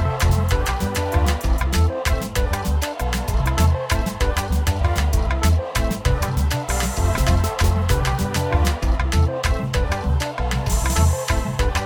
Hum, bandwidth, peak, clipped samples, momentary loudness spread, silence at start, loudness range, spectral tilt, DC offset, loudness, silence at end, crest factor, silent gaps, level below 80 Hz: none; over 20 kHz; -4 dBFS; under 0.1%; 4 LU; 0 s; 1 LU; -5 dB/octave; under 0.1%; -21 LUFS; 0 s; 14 dB; none; -22 dBFS